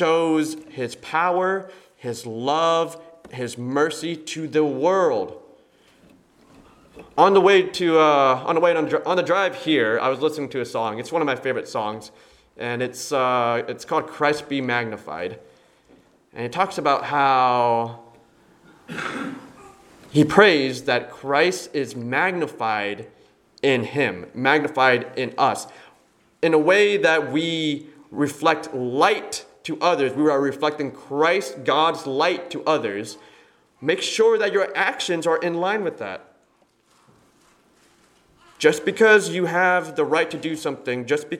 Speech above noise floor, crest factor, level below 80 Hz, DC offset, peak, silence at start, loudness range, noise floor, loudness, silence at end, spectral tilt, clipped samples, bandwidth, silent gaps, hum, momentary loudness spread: 41 dB; 22 dB; -66 dBFS; under 0.1%; 0 dBFS; 0 s; 5 LU; -62 dBFS; -21 LUFS; 0 s; -4.5 dB/octave; under 0.1%; 15.5 kHz; none; none; 14 LU